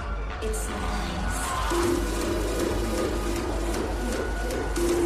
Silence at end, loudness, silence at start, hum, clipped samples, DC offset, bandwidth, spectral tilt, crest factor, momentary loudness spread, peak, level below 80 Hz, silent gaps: 0 s; -28 LUFS; 0 s; none; under 0.1%; under 0.1%; 15 kHz; -5 dB/octave; 14 dB; 4 LU; -14 dBFS; -32 dBFS; none